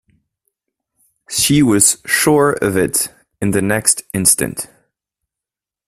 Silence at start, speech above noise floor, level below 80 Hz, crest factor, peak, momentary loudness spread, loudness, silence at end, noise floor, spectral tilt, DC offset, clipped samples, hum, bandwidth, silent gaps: 1.3 s; 72 dB; -48 dBFS; 18 dB; 0 dBFS; 11 LU; -14 LUFS; 1.2 s; -87 dBFS; -3.5 dB/octave; under 0.1%; under 0.1%; none; 16 kHz; none